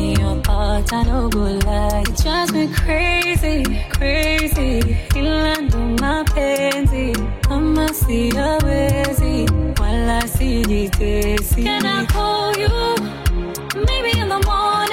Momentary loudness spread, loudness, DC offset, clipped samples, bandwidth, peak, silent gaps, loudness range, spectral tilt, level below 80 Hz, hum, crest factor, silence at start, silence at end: 3 LU; -18 LUFS; 0.7%; under 0.1%; 16.5 kHz; -4 dBFS; none; 1 LU; -5 dB/octave; -20 dBFS; none; 14 dB; 0 s; 0 s